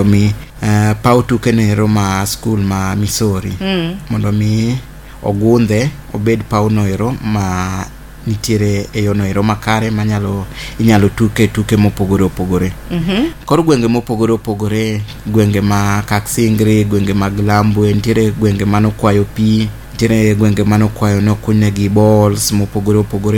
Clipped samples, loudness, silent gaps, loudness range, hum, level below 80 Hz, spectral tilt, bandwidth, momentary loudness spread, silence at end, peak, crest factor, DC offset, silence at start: under 0.1%; -14 LUFS; none; 3 LU; none; -32 dBFS; -6.5 dB/octave; 17.5 kHz; 7 LU; 0 s; 0 dBFS; 12 dB; under 0.1%; 0 s